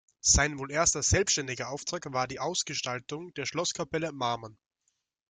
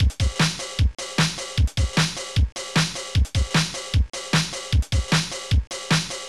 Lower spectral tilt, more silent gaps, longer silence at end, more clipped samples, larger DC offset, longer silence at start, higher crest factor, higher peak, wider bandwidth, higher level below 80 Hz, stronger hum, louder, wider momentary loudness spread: second, -2.5 dB/octave vs -4 dB/octave; second, none vs 2.52-2.56 s; first, 0.75 s vs 0 s; neither; second, under 0.1% vs 0.4%; first, 0.25 s vs 0 s; first, 22 dB vs 12 dB; about the same, -10 dBFS vs -12 dBFS; second, 11 kHz vs 13.5 kHz; second, -46 dBFS vs -26 dBFS; neither; second, -29 LUFS vs -23 LUFS; first, 11 LU vs 3 LU